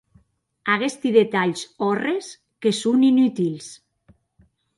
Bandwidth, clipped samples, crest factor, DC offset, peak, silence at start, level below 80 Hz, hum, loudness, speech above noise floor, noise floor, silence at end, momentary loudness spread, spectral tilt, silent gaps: 11.5 kHz; under 0.1%; 18 dB; under 0.1%; -4 dBFS; 0.65 s; -68 dBFS; none; -21 LUFS; 41 dB; -61 dBFS; 1.05 s; 13 LU; -5 dB/octave; none